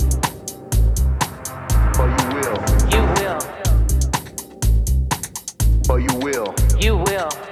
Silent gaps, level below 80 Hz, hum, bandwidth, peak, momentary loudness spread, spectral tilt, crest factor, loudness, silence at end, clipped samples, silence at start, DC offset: none; -20 dBFS; none; 15.5 kHz; -2 dBFS; 8 LU; -5 dB/octave; 14 dB; -20 LUFS; 0 s; under 0.1%; 0 s; under 0.1%